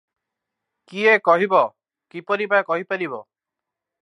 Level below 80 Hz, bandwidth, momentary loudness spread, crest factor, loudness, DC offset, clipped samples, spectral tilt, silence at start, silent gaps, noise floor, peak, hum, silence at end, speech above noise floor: -82 dBFS; 10.5 kHz; 19 LU; 18 dB; -19 LUFS; under 0.1%; under 0.1%; -5.5 dB/octave; 0.9 s; none; -86 dBFS; -4 dBFS; none; 0.8 s; 66 dB